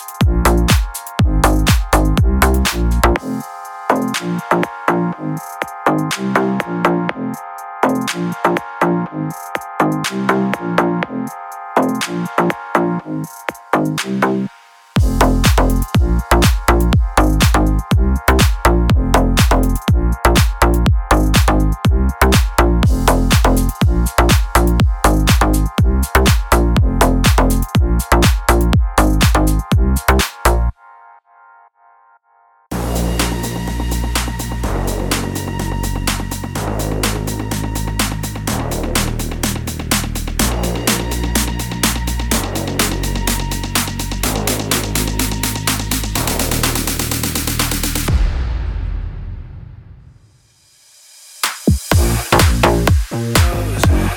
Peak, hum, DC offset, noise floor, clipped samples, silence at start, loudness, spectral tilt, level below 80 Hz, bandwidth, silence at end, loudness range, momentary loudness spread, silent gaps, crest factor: 0 dBFS; none; under 0.1%; -53 dBFS; under 0.1%; 0 s; -16 LUFS; -4.5 dB/octave; -20 dBFS; 19.5 kHz; 0 s; 6 LU; 9 LU; none; 16 dB